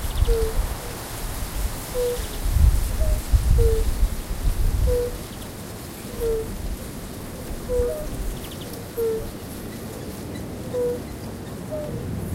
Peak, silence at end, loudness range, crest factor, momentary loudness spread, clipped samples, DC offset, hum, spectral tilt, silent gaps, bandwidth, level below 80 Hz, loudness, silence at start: -4 dBFS; 0 s; 6 LU; 20 dB; 13 LU; under 0.1%; under 0.1%; none; -5.5 dB/octave; none; 16 kHz; -26 dBFS; -27 LUFS; 0 s